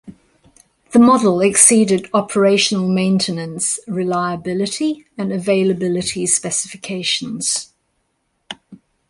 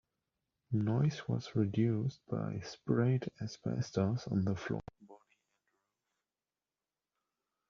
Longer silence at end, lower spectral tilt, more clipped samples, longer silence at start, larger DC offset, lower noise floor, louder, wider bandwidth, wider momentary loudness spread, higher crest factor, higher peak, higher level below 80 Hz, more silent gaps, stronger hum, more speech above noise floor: second, 0.35 s vs 2.55 s; second, -3.5 dB/octave vs -8 dB/octave; neither; second, 0.05 s vs 0.7 s; neither; second, -68 dBFS vs under -90 dBFS; first, -16 LUFS vs -36 LUFS; first, 12 kHz vs 7.2 kHz; first, 12 LU vs 9 LU; about the same, 18 dB vs 20 dB; first, 0 dBFS vs -18 dBFS; first, -58 dBFS vs -68 dBFS; neither; neither; second, 52 dB vs over 56 dB